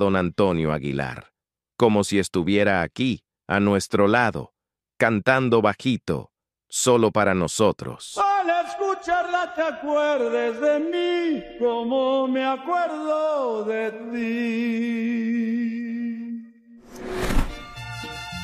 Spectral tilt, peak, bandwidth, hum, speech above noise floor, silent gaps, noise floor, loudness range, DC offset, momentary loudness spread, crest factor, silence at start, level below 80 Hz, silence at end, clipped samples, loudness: -5 dB/octave; -4 dBFS; 15 kHz; none; 25 dB; none; -47 dBFS; 5 LU; under 0.1%; 13 LU; 20 dB; 0 s; -40 dBFS; 0 s; under 0.1%; -23 LUFS